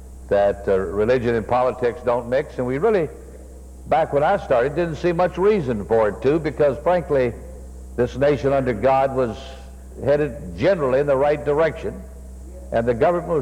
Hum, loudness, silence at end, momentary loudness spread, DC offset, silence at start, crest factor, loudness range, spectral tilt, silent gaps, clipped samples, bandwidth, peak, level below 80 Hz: none; -20 LUFS; 0 s; 19 LU; under 0.1%; 0 s; 14 dB; 2 LU; -7.5 dB/octave; none; under 0.1%; 13 kHz; -6 dBFS; -38 dBFS